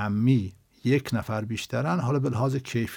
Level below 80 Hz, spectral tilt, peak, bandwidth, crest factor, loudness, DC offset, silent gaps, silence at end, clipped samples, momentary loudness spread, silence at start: -60 dBFS; -7 dB/octave; -10 dBFS; 17 kHz; 16 dB; -26 LUFS; under 0.1%; none; 0 s; under 0.1%; 7 LU; 0 s